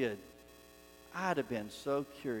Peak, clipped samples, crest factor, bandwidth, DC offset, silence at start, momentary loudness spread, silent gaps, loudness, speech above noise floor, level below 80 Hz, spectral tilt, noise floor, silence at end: -20 dBFS; under 0.1%; 20 dB; 17.5 kHz; under 0.1%; 0 s; 22 LU; none; -38 LUFS; 21 dB; -68 dBFS; -5.5 dB/octave; -58 dBFS; 0 s